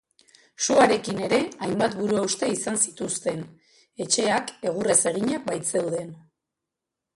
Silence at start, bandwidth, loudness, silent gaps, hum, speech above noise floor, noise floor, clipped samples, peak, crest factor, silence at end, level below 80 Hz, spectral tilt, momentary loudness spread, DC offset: 0.6 s; 11.5 kHz; -24 LUFS; none; none; 62 dB; -86 dBFS; under 0.1%; -4 dBFS; 22 dB; 0.95 s; -64 dBFS; -3 dB/octave; 10 LU; under 0.1%